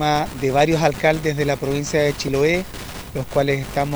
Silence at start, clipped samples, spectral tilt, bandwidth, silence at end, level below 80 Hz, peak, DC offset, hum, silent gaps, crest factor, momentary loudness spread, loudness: 0 s; under 0.1%; -5 dB/octave; over 20 kHz; 0 s; -40 dBFS; -2 dBFS; under 0.1%; none; none; 18 dB; 9 LU; -20 LUFS